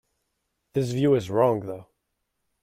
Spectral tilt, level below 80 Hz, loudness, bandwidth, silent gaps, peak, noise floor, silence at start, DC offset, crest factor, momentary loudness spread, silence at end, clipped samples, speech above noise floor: -7.5 dB/octave; -62 dBFS; -24 LUFS; 15.5 kHz; none; -8 dBFS; -78 dBFS; 0.75 s; under 0.1%; 18 dB; 14 LU; 0.8 s; under 0.1%; 55 dB